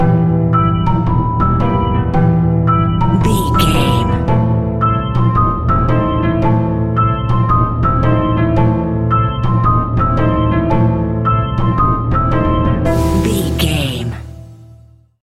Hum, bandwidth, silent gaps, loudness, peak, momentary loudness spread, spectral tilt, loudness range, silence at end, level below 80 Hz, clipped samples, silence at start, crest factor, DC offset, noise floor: none; 14 kHz; none; -14 LUFS; 0 dBFS; 2 LU; -7.5 dB/octave; 1 LU; 0.6 s; -24 dBFS; under 0.1%; 0 s; 12 dB; under 0.1%; -43 dBFS